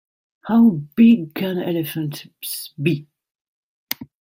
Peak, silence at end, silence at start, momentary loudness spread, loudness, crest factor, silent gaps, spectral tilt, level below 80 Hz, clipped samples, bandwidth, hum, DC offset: 0 dBFS; 0.15 s; 0.45 s; 15 LU; -20 LUFS; 20 dB; 3.31-3.87 s; -6 dB/octave; -64 dBFS; under 0.1%; 16.5 kHz; none; under 0.1%